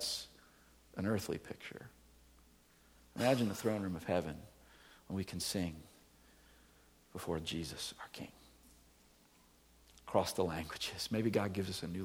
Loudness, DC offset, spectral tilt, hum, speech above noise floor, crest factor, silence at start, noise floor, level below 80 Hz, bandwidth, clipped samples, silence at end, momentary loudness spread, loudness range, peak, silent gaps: -39 LUFS; under 0.1%; -4.5 dB/octave; none; 29 dB; 24 dB; 0 s; -67 dBFS; -64 dBFS; over 20 kHz; under 0.1%; 0 s; 19 LU; 8 LU; -16 dBFS; none